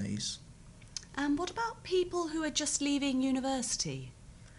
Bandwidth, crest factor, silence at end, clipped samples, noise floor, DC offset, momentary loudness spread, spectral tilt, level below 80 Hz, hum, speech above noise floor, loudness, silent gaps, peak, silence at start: 11.5 kHz; 18 dB; 0 s; under 0.1%; -53 dBFS; under 0.1%; 14 LU; -3 dB/octave; -56 dBFS; none; 20 dB; -33 LUFS; none; -16 dBFS; 0 s